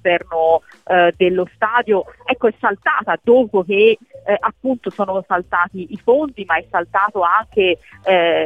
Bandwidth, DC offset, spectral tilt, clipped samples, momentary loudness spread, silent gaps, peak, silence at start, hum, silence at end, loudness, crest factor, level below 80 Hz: 4.7 kHz; under 0.1%; -7 dB/octave; under 0.1%; 8 LU; none; -2 dBFS; 0.05 s; none; 0 s; -17 LUFS; 16 dB; -54 dBFS